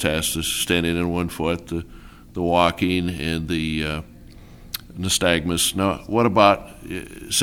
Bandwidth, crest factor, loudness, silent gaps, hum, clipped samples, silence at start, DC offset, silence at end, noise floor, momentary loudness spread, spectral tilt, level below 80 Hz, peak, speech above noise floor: over 20 kHz; 22 dB; -21 LUFS; none; none; under 0.1%; 0 s; 0.1%; 0 s; -43 dBFS; 15 LU; -4 dB/octave; -40 dBFS; 0 dBFS; 22 dB